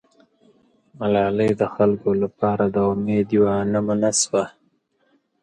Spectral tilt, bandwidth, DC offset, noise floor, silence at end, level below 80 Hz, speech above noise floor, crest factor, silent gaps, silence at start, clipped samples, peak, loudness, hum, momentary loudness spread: -5 dB/octave; 11.5 kHz; under 0.1%; -65 dBFS; 0.95 s; -54 dBFS; 45 dB; 16 dB; none; 1 s; under 0.1%; -4 dBFS; -20 LUFS; none; 4 LU